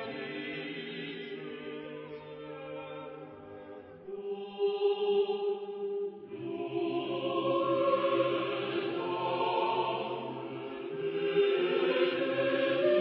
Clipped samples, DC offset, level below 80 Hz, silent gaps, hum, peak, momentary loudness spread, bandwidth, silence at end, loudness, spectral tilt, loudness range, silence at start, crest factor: under 0.1%; under 0.1%; -78 dBFS; none; none; -16 dBFS; 16 LU; 5.4 kHz; 0 s; -32 LUFS; -3 dB/octave; 11 LU; 0 s; 16 dB